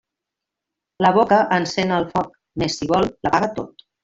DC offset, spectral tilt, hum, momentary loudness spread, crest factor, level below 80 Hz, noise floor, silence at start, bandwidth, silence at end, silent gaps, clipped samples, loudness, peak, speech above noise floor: under 0.1%; -5.5 dB/octave; none; 10 LU; 18 dB; -50 dBFS; -84 dBFS; 1 s; 7.8 kHz; 0.35 s; none; under 0.1%; -19 LUFS; -2 dBFS; 65 dB